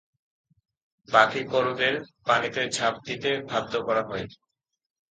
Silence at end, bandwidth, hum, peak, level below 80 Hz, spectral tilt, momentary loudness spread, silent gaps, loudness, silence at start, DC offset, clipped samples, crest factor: 0.8 s; 9.6 kHz; none; -4 dBFS; -64 dBFS; -3.5 dB/octave; 10 LU; none; -25 LUFS; 1.1 s; under 0.1%; under 0.1%; 24 dB